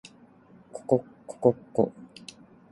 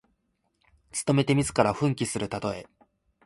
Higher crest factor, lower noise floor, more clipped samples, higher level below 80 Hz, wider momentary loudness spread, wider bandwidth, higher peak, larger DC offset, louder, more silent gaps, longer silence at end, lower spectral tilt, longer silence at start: about the same, 24 dB vs 22 dB; second, -55 dBFS vs -74 dBFS; neither; second, -66 dBFS vs -56 dBFS; first, 20 LU vs 11 LU; about the same, 11.5 kHz vs 11.5 kHz; about the same, -6 dBFS vs -6 dBFS; neither; about the same, -27 LUFS vs -26 LUFS; neither; about the same, 0.65 s vs 0.65 s; first, -7.5 dB/octave vs -5.5 dB/octave; second, 0.75 s vs 0.95 s